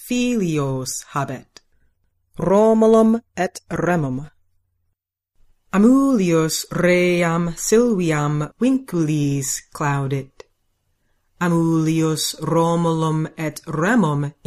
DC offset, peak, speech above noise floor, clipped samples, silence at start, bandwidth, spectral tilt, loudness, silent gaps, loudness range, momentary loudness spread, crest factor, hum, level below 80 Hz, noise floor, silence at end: under 0.1%; -4 dBFS; 55 dB; under 0.1%; 0 s; 15.5 kHz; -5.5 dB/octave; -19 LUFS; none; 5 LU; 11 LU; 16 dB; none; -48 dBFS; -74 dBFS; 0.15 s